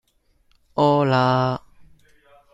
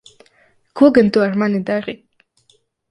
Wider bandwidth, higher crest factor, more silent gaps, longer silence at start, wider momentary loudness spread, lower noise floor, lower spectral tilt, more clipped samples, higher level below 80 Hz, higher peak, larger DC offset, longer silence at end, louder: second, 7.8 kHz vs 10.5 kHz; about the same, 18 dB vs 18 dB; neither; about the same, 0.75 s vs 0.75 s; second, 13 LU vs 22 LU; first, -63 dBFS vs -59 dBFS; about the same, -7.5 dB/octave vs -7.5 dB/octave; neither; about the same, -58 dBFS vs -56 dBFS; second, -4 dBFS vs 0 dBFS; neither; about the same, 0.95 s vs 0.95 s; second, -20 LUFS vs -15 LUFS